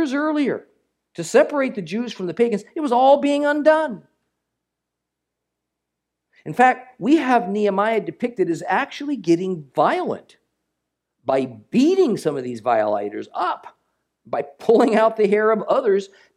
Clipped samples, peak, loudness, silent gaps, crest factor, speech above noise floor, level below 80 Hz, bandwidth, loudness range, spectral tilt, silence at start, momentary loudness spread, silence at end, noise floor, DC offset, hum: under 0.1%; -2 dBFS; -20 LUFS; none; 18 dB; 62 dB; -74 dBFS; 13 kHz; 4 LU; -6 dB/octave; 0 s; 11 LU; 0.3 s; -82 dBFS; under 0.1%; none